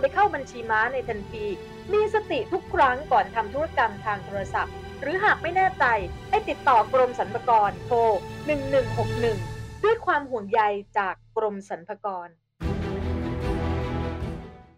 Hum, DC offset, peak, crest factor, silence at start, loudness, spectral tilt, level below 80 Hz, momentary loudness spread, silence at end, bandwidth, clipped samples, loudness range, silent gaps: none; under 0.1%; -8 dBFS; 16 dB; 0 s; -25 LUFS; -6.5 dB/octave; -42 dBFS; 11 LU; 0.15 s; 13.5 kHz; under 0.1%; 6 LU; none